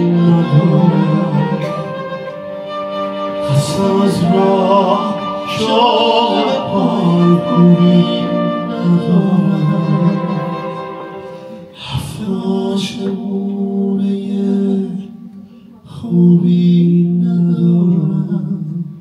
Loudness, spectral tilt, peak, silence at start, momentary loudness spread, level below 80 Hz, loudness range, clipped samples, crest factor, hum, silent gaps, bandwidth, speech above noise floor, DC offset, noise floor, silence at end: -14 LUFS; -7.5 dB/octave; 0 dBFS; 0 s; 13 LU; -52 dBFS; 7 LU; under 0.1%; 14 dB; none; none; 11 kHz; 27 dB; under 0.1%; -38 dBFS; 0 s